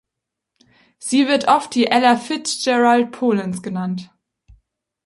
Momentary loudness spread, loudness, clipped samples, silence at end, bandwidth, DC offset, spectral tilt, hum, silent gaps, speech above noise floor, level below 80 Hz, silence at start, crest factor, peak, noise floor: 11 LU; -18 LUFS; under 0.1%; 1 s; 11.5 kHz; under 0.1%; -4 dB/octave; none; none; 65 dB; -62 dBFS; 1 s; 18 dB; -2 dBFS; -82 dBFS